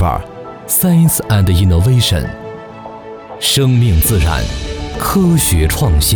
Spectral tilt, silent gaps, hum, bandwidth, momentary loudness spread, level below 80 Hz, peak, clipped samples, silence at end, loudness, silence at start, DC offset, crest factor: -5 dB/octave; none; none; over 20 kHz; 19 LU; -22 dBFS; -2 dBFS; under 0.1%; 0 s; -13 LUFS; 0 s; under 0.1%; 10 dB